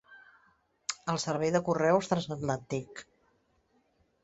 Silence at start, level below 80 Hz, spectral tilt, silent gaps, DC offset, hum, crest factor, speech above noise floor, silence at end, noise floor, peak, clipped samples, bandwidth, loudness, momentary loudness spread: 0.1 s; -66 dBFS; -5 dB/octave; none; under 0.1%; none; 22 dB; 41 dB; 1.2 s; -71 dBFS; -12 dBFS; under 0.1%; 8.2 kHz; -31 LUFS; 12 LU